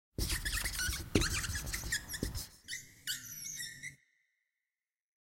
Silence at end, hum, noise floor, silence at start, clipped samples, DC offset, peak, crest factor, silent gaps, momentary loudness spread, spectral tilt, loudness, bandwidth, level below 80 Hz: 1.3 s; none; under -90 dBFS; 0.2 s; under 0.1%; under 0.1%; -10 dBFS; 28 dB; none; 11 LU; -2.5 dB/octave; -37 LUFS; 16.5 kHz; -46 dBFS